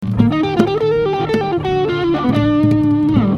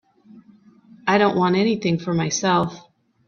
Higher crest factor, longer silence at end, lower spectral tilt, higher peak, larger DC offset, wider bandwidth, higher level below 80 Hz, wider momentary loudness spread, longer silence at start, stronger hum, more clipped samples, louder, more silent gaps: about the same, 14 dB vs 18 dB; second, 0 s vs 0.5 s; first, -8.5 dB/octave vs -5 dB/octave; first, 0 dBFS vs -4 dBFS; neither; about the same, 7 kHz vs 7 kHz; first, -38 dBFS vs -60 dBFS; about the same, 4 LU vs 5 LU; second, 0 s vs 0.35 s; neither; neither; first, -15 LUFS vs -20 LUFS; neither